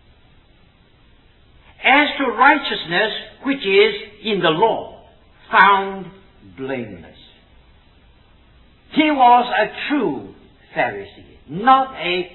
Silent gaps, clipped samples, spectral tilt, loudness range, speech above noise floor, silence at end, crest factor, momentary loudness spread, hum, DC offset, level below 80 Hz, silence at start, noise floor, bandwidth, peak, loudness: none; under 0.1%; -7.5 dB/octave; 4 LU; 35 dB; 0.05 s; 20 dB; 19 LU; none; under 0.1%; -52 dBFS; 1.8 s; -52 dBFS; 4.3 kHz; 0 dBFS; -17 LUFS